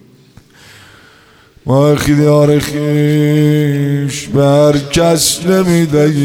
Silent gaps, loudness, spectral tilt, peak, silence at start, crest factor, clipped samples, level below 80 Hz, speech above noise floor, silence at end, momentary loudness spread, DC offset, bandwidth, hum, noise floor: none; -11 LUFS; -5.5 dB/octave; 0 dBFS; 1.65 s; 12 dB; under 0.1%; -38 dBFS; 34 dB; 0 s; 6 LU; under 0.1%; 16.5 kHz; none; -44 dBFS